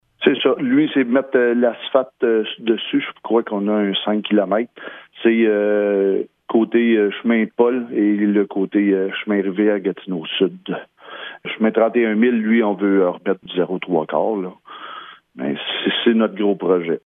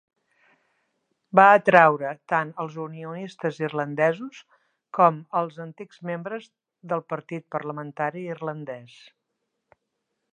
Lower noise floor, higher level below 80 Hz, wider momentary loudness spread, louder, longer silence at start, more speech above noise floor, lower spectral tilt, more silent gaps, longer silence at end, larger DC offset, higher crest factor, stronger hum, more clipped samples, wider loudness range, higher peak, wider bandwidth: second, -37 dBFS vs -79 dBFS; about the same, -74 dBFS vs -78 dBFS; second, 13 LU vs 20 LU; first, -18 LUFS vs -23 LUFS; second, 0.2 s vs 1.35 s; second, 19 dB vs 56 dB; first, -9 dB/octave vs -7 dB/octave; neither; second, 0.05 s vs 1.45 s; neither; second, 18 dB vs 24 dB; neither; neither; second, 3 LU vs 12 LU; about the same, 0 dBFS vs 0 dBFS; second, 3.9 kHz vs 9.6 kHz